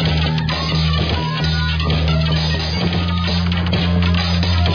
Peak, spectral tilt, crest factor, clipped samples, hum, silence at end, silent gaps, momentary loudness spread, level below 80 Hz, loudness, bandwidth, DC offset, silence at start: -4 dBFS; -6.5 dB/octave; 12 dB; under 0.1%; none; 0 s; none; 2 LU; -26 dBFS; -17 LUFS; 5.4 kHz; under 0.1%; 0 s